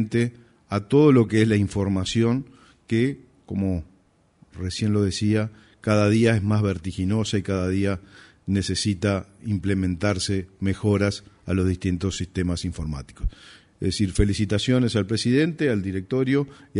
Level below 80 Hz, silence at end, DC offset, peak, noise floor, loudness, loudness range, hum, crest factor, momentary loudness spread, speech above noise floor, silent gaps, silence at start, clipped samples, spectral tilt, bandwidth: -40 dBFS; 0 s; under 0.1%; -6 dBFS; -60 dBFS; -23 LUFS; 5 LU; none; 18 dB; 11 LU; 38 dB; none; 0 s; under 0.1%; -6 dB/octave; 11 kHz